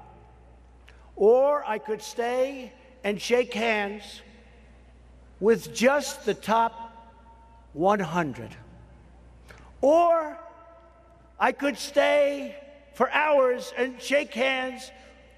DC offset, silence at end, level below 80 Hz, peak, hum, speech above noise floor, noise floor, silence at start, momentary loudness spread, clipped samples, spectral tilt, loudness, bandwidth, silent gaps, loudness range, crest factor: under 0.1%; 0.45 s; -56 dBFS; -8 dBFS; none; 29 dB; -54 dBFS; 1.15 s; 20 LU; under 0.1%; -4 dB/octave; -25 LUFS; 14 kHz; none; 4 LU; 20 dB